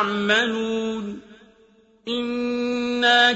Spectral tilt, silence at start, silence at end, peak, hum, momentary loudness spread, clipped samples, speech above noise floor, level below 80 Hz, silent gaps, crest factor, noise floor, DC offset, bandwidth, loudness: -3.5 dB/octave; 0 s; 0 s; -4 dBFS; none; 15 LU; under 0.1%; 35 dB; -60 dBFS; none; 18 dB; -56 dBFS; under 0.1%; 8 kHz; -22 LUFS